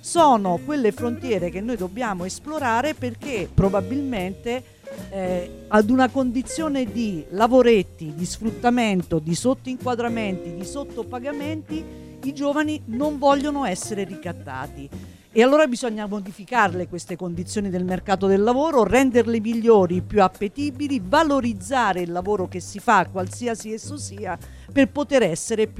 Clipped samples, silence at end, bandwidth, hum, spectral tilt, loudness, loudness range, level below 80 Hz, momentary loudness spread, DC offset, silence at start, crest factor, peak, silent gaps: under 0.1%; 0 s; 15 kHz; none; -5.5 dB/octave; -22 LUFS; 6 LU; -46 dBFS; 14 LU; under 0.1%; 0.05 s; 18 dB; -4 dBFS; none